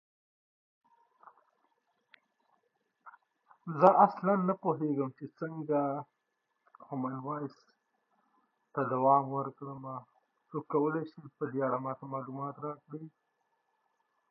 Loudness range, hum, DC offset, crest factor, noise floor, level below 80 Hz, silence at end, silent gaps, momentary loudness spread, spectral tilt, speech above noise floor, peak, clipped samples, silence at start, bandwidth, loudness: 9 LU; none; under 0.1%; 26 dB; -82 dBFS; -88 dBFS; 1.25 s; none; 19 LU; -8.5 dB/octave; 50 dB; -8 dBFS; under 0.1%; 3.05 s; 6.6 kHz; -32 LUFS